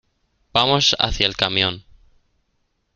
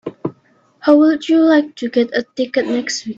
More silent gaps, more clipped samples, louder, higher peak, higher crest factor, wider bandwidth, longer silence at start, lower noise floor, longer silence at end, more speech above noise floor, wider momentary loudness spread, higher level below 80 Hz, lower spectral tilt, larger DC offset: neither; neither; second, -18 LUFS vs -15 LUFS; about the same, 0 dBFS vs 0 dBFS; first, 22 dB vs 16 dB; first, 12 kHz vs 7.8 kHz; first, 0.55 s vs 0.05 s; first, -69 dBFS vs -54 dBFS; first, 1.15 s vs 0.05 s; first, 50 dB vs 39 dB; second, 7 LU vs 12 LU; first, -40 dBFS vs -62 dBFS; second, -3 dB/octave vs -4.5 dB/octave; neither